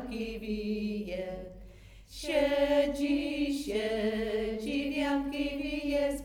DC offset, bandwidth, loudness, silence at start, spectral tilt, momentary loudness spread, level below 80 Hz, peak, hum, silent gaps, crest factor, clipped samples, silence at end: under 0.1%; 17.5 kHz; -32 LUFS; 0 s; -5 dB/octave; 12 LU; -50 dBFS; -16 dBFS; none; none; 16 dB; under 0.1%; 0 s